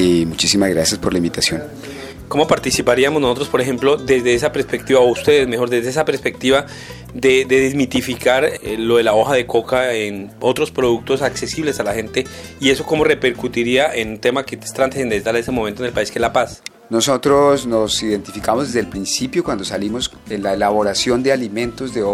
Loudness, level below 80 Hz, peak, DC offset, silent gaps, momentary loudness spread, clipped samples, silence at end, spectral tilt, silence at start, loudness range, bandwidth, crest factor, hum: -17 LUFS; -42 dBFS; 0 dBFS; under 0.1%; none; 9 LU; under 0.1%; 0 s; -4 dB/octave; 0 s; 3 LU; 16 kHz; 16 dB; none